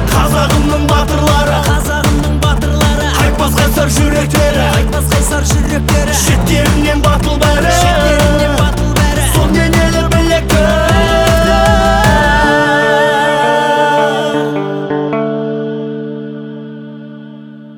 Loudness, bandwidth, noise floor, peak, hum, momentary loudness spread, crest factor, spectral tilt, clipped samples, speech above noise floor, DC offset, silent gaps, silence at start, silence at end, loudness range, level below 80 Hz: -11 LUFS; over 20 kHz; -31 dBFS; 0 dBFS; none; 9 LU; 10 dB; -5 dB/octave; under 0.1%; 21 dB; under 0.1%; none; 0 s; 0 s; 4 LU; -18 dBFS